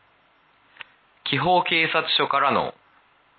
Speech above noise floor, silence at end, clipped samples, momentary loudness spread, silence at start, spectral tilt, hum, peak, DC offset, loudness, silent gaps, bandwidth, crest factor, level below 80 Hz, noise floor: 39 dB; 0.7 s; under 0.1%; 9 LU; 1.25 s; -9 dB/octave; none; -6 dBFS; under 0.1%; -21 LUFS; none; 4.7 kHz; 18 dB; -62 dBFS; -60 dBFS